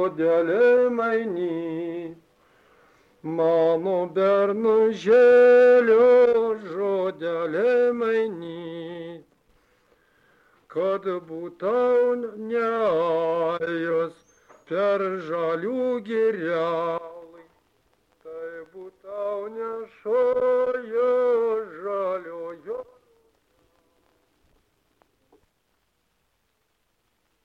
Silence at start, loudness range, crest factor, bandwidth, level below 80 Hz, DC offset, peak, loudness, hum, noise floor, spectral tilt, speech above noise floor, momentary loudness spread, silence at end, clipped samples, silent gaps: 0 s; 14 LU; 14 dB; 6.6 kHz; -70 dBFS; under 0.1%; -10 dBFS; -22 LUFS; none; -72 dBFS; -7 dB/octave; 50 dB; 19 LU; 4.6 s; under 0.1%; none